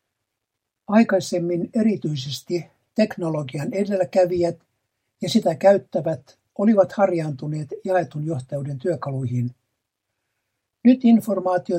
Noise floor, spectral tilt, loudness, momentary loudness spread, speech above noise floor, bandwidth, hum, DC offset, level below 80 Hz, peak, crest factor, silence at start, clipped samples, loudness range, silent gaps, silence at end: -81 dBFS; -7 dB/octave; -22 LUFS; 12 LU; 61 dB; 15.5 kHz; none; under 0.1%; -66 dBFS; -4 dBFS; 18 dB; 0.9 s; under 0.1%; 4 LU; none; 0 s